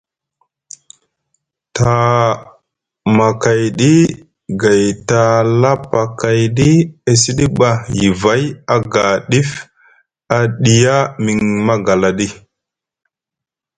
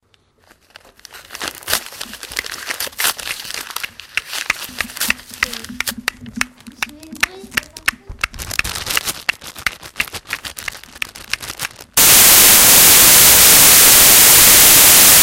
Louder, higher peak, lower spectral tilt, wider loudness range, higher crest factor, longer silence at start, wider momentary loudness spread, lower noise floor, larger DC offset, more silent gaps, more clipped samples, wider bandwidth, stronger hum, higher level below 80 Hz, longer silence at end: second, -13 LUFS vs -7 LUFS; about the same, 0 dBFS vs 0 dBFS; first, -5.5 dB/octave vs 0.5 dB/octave; second, 3 LU vs 17 LU; about the same, 14 dB vs 14 dB; first, 1.75 s vs 1.35 s; second, 7 LU vs 22 LU; first, -85 dBFS vs -55 dBFS; neither; neither; second, under 0.1% vs 0.4%; second, 9.6 kHz vs over 20 kHz; neither; about the same, -42 dBFS vs -40 dBFS; first, 1.45 s vs 0 s